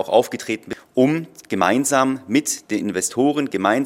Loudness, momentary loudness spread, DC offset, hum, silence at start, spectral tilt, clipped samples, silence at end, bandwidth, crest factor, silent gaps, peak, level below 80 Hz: -20 LUFS; 9 LU; under 0.1%; none; 0 s; -4 dB/octave; under 0.1%; 0 s; 16.5 kHz; 18 dB; none; -2 dBFS; -68 dBFS